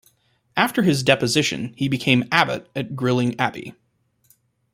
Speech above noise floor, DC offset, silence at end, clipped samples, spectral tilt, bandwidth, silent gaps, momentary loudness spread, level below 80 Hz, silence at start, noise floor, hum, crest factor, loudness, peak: 41 dB; under 0.1%; 1.05 s; under 0.1%; -4.5 dB/octave; 16 kHz; none; 11 LU; -58 dBFS; 0.55 s; -62 dBFS; none; 22 dB; -20 LUFS; 0 dBFS